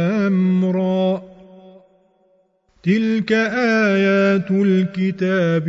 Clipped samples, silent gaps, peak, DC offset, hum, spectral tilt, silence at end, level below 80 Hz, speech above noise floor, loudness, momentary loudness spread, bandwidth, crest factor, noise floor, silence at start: under 0.1%; none; -6 dBFS; under 0.1%; none; -7.5 dB/octave; 0 s; -60 dBFS; 44 dB; -18 LUFS; 5 LU; 7.4 kHz; 12 dB; -60 dBFS; 0 s